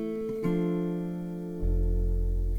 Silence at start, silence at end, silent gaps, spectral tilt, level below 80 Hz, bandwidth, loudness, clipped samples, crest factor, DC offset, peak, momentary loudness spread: 0 s; 0 s; none; -9.5 dB/octave; -30 dBFS; 3.4 kHz; -31 LUFS; under 0.1%; 10 dB; under 0.1%; -18 dBFS; 6 LU